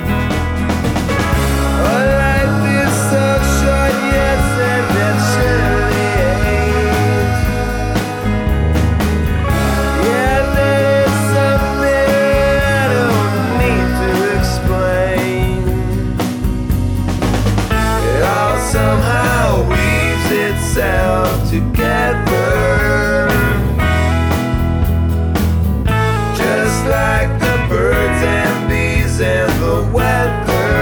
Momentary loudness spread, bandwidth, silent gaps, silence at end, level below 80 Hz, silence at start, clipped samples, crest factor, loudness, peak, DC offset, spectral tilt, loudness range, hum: 3 LU; over 20 kHz; none; 0 s; -20 dBFS; 0 s; under 0.1%; 12 dB; -14 LUFS; -2 dBFS; under 0.1%; -6 dB/octave; 2 LU; none